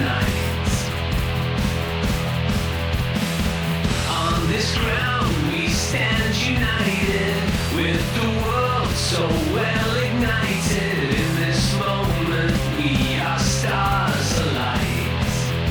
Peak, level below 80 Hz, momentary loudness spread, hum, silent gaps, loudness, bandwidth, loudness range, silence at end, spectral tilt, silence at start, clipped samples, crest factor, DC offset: -6 dBFS; -30 dBFS; 3 LU; none; none; -21 LUFS; over 20 kHz; 2 LU; 0 s; -4.5 dB/octave; 0 s; under 0.1%; 14 dB; under 0.1%